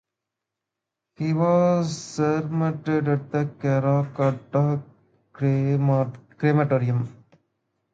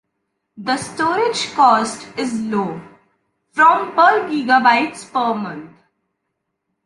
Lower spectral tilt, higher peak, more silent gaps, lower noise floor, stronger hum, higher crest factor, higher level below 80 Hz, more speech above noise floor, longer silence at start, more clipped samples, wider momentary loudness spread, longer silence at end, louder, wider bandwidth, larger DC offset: first, -8 dB/octave vs -3.5 dB/octave; second, -8 dBFS vs -2 dBFS; neither; first, -85 dBFS vs -75 dBFS; neither; about the same, 16 dB vs 16 dB; about the same, -64 dBFS vs -62 dBFS; first, 63 dB vs 59 dB; first, 1.2 s vs 0.55 s; neither; second, 7 LU vs 14 LU; second, 0.8 s vs 1.15 s; second, -23 LUFS vs -17 LUFS; second, 7.8 kHz vs 11.5 kHz; neither